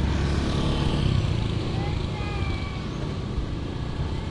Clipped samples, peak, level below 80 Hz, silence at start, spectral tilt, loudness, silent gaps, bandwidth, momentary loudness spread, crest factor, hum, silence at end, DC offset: under 0.1%; -10 dBFS; -32 dBFS; 0 s; -6.5 dB/octave; -27 LUFS; none; 11 kHz; 7 LU; 14 dB; none; 0 s; under 0.1%